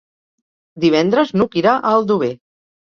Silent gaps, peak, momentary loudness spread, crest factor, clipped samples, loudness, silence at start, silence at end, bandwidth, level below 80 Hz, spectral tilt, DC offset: none; -2 dBFS; 6 LU; 16 dB; under 0.1%; -16 LUFS; 0.75 s; 0.5 s; 7 kHz; -58 dBFS; -6.5 dB/octave; under 0.1%